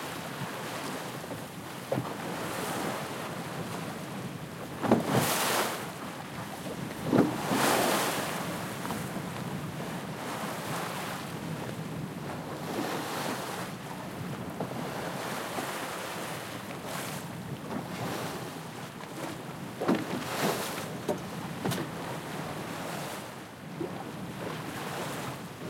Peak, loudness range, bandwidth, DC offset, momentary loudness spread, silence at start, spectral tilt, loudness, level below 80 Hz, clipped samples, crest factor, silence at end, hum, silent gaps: -10 dBFS; 7 LU; 16.5 kHz; under 0.1%; 12 LU; 0 s; -4.5 dB/octave; -34 LUFS; -66 dBFS; under 0.1%; 24 dB; 0 s; none; none